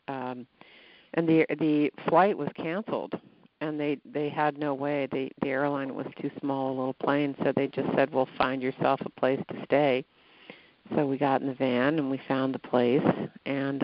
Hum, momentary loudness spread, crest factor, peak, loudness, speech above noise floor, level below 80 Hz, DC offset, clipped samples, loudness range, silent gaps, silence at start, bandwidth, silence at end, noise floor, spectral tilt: none; 9 LU; 20 dB; -8 dBFS; -28 LUFS; 24 dB; -70 dBFS; under 0.1%; under 0.1%; 3 LU; none; 0.1 s; 5.4 kHz; 0 s; -52 dBFS; -5 dB/octave